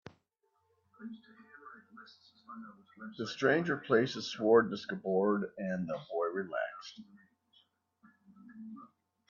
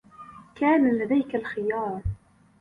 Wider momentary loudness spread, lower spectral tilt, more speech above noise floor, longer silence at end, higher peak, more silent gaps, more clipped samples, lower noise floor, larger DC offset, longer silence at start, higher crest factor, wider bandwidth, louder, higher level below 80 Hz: about the same, 26 LU vs 24 LU; second, -6 dB/octave vs -9 dB/octave; first, 45 dB vs 23 dB; about the same, 0.45 s vs 0.45 s; second, -14 dBFS vs -10 dBFS; neither; neither; first, -78 dBFS vs -47 dBFS; neither; first, 1 s vs 0.2 s; first, 22 dB vs 16 dB; first, 7.2 kHz vs 4.8 kHz; second, -32 LUFS vs -25 LUFS; second, -80 dBFS vs -46 dBFS